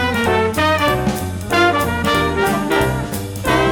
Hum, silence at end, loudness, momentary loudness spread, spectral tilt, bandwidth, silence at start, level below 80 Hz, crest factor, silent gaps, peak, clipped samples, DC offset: none; 0 s; -17 LUFS; 7 LU; -5 dB/octave; 19 kHz; 0 s; -34 dBFS; 14 dB; none; -2 dBFS; under 0.1%; under 0.1%